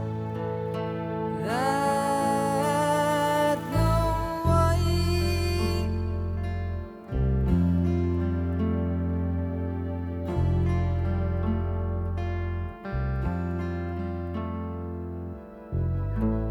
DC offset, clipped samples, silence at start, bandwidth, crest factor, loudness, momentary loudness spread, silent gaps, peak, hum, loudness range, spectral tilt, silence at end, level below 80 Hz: under 0.1%; under 0.1%; 0 s; 15 kHz; 16 dB; -27 LUFS; 9 LU; none; -10 dBFS; none; 7 LU; -7 dB/octave; 0 s; -34 dBFS